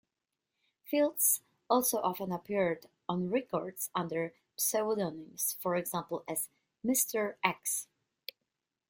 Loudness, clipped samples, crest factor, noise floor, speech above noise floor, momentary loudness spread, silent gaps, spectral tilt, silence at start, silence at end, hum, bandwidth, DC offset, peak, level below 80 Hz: -33 LUFS; under 0.1%; 24 dB; -88 dBFS; 55 dB; 11 LU; none; -3.5 dB/octave; 0.85 s; 1.05 s; none; 17 kHz; under 0.1%; -10 dBFS; -76 dBFS